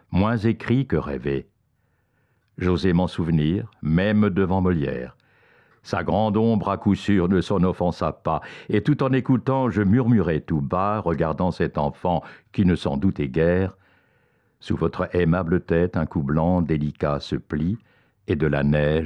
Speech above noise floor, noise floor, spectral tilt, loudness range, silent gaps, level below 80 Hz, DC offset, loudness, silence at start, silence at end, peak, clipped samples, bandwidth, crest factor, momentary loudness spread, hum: 46 dB; -67 dBFS; -8.5 dB/octave; 3 LU; none; -44 dBFS; under 0.1%; -23 LUFS; 0.1 s; 0 s; -10 dBFS; under 0.1%; 9.4 kHz; 14 dB; 7 LU; none